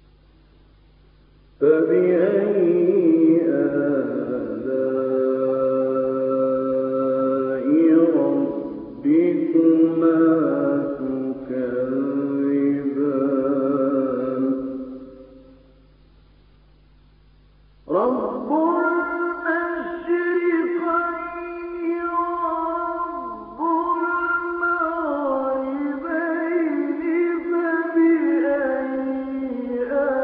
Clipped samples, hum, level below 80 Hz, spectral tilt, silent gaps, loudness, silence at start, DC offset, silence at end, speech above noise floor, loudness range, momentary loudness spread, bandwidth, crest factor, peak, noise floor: under 0.1%; none; -58 dBFS; -7 dB/octave; none; -21 LUFS; 1.6 s; under 0.1%; 0 s; 34 dB; 6 LU; 9 LU; 3.9 kHz; 16 dB; -6 dBFS; -53 dBFS